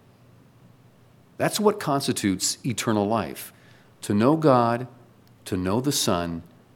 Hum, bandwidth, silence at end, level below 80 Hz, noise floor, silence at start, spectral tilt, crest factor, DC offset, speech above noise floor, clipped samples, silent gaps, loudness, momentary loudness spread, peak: none; 17.5 kHz; 0.35 s; -60 dBFS; -55 dBFS; 1.4 s; -4.5 dB/octave; 22 dB; under 0.1%; 32 dB; under 0.1%; none; -24 LUFS; 18 LU; -4 dBFS